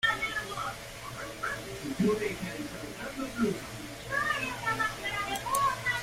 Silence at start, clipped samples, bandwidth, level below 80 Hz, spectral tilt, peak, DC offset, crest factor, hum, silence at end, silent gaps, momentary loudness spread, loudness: 0 s; under 0.1%; 16 kHz; -54 dBFS; -3.5 dB/octave; -12 dBFS; under 0.1%; 20 dB; none; 0 s; none; 11 LU; -32 LUFS